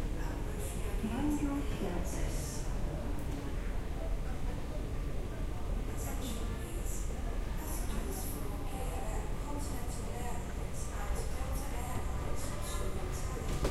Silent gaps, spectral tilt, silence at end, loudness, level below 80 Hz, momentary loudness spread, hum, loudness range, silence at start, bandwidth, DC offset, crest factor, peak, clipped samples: none; -5.5 dB/octave; 0 s; -39 LUFS; -38 dBFS; 4 LU; none; 3 LU; 0 s; 15.5 kHz; under 0.1%; 16 dB; -20 dBFS; under 0.1%